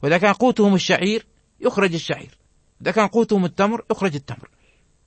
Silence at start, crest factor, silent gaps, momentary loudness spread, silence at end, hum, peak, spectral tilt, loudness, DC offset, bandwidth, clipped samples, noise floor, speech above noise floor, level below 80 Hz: 0 s; 18 dB; none; 12 LU; 0.7 s; none; -2 dBFS; -5.5 dB/octave; -20 LUFS; under 0.1%; 8.8 kHz; under 0.1%; -58 dBFS; 39 dB; -58 dBFS